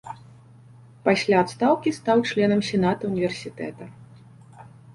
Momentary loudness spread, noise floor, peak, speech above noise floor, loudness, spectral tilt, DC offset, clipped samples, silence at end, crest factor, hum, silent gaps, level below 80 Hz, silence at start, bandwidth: 19 LU; -49 dBFS; -6 dBFS; 27 dB; -22 LUFS; -6 dB/octave; under 0.1%; under 0.1%; 0.05 s; 20 dB; none; none; -58 dBFS; 0.05 s; 11.5 kHz